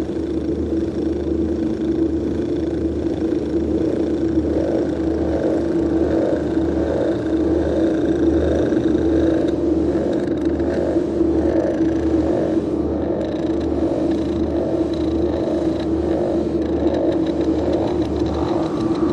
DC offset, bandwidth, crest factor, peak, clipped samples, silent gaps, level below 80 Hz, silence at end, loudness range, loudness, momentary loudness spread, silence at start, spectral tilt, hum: under 0.1%; 8.4 kHz; 12 dB; -6 dBFS; under 0.1%; none; -34 dBFS; 0 s; 2 LU; -20 LUFS; 4 LU; 0 s; -8.5 dB/octave; none